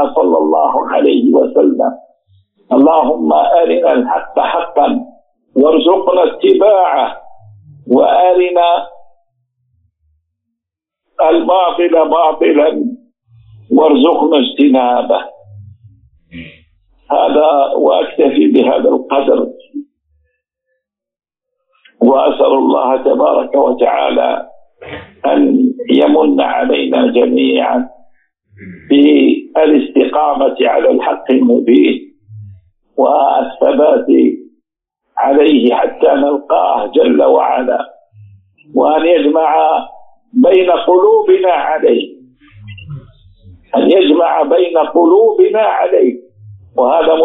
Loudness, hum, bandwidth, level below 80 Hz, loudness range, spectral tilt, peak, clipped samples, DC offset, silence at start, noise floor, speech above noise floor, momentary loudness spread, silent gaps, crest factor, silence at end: -11 LUFS; none; 4 kHz; -56 dBFS; 4 LU; -3 dB/octave; 0 dBFS; under 0.1%; under 0.1%; 0 s; -81 dBFS; 71 dB; 9 LU; none; 12 dB; 0 s